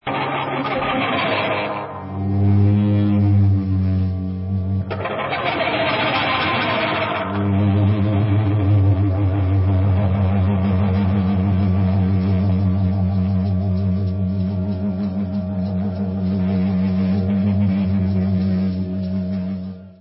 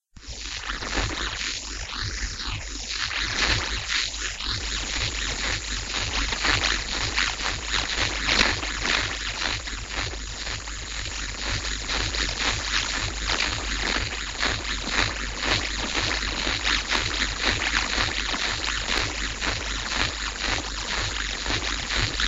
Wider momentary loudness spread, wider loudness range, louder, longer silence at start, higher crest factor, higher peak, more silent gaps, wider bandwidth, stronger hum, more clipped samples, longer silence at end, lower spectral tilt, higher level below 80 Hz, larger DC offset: about the same, 7 LU vs 8 LU; about the same, 3 LU vs 4 LU; first, -19 LUFS vs -25 LUFS; about the same, 0.05 s vs 0.15 s; second, 12 dB vs 24 dB; about the same, -6 dBFS vs -4 dBFS; neither; second, 5.6 kHz vs 8.8 kHz; neither; neither; about the same, 0.05 s vs 0 s; first, -12.5 dB/octave vs -2 dB/octave; about the same, -32 dBFS vs -34 dBFS; neither